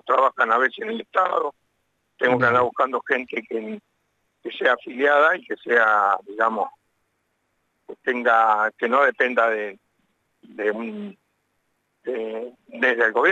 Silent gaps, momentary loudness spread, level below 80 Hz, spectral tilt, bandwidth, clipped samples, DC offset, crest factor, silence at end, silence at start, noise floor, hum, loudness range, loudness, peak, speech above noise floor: none; 15 LU; -72 dBFS; -5.5 dB/octave; 8 kHz; under 0.1%; under 0.1%; 16 dB; 0 s; 0.05 s; -72 dBFS; none; 5 LU; -21 LUFS; -6 dBFS; 51 dB